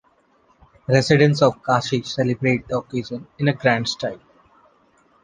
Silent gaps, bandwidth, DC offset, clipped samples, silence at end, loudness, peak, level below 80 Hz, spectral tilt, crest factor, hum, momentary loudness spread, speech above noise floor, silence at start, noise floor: none; 9.6 kHz; under 0.1%; under 0.1%; 1.05 s; -20 LUFS; 0 dBFS; -56 dBFS; -6 dB/octave; 20 dB; none; 13 LU; 40 dB; 0.9 s; -59 dBFS